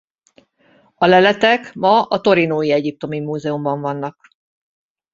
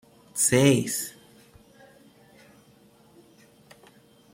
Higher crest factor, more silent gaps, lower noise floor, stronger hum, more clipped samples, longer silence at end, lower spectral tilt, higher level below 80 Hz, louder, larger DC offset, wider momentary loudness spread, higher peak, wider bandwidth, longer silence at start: second, 16 dB vs 22 dB; neither; about the same, -55 dBFS vs -57 dBFS; neither; neither; second, 1 s vs 3.25 s; first, -6 dB/octave vs -4 dB/octave; about the same, -62 dBFS vs -64 dBFS; first, -16 LUFS vs -23 LUFS; neither; second, 12 LU vs 17 LU; first, -2 dBFS vs -8 dBFS; second, 7.6 kHz vs 16.5 kHz; first, 1 s vs 0.35 s